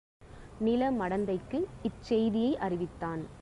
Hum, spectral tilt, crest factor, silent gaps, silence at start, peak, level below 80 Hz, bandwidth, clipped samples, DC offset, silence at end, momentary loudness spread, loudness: none; -7.5 dB/octave; 14 dB; none; 0.2 s; -18 dBFS; -54 dBFS; 11 kHz; under 0.1%; under 0.1%; 0 s; 9 LU; -32 LUFS